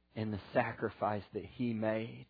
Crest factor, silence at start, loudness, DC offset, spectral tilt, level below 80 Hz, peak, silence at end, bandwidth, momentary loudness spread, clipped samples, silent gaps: 20 dB; 0.15 s; -37 LUFS; under 0.1%; -6 dB/octave; -68 dBFS; -18 dBFS; 0.05 s; 5 kHz; 6 LU; under 0.1%; none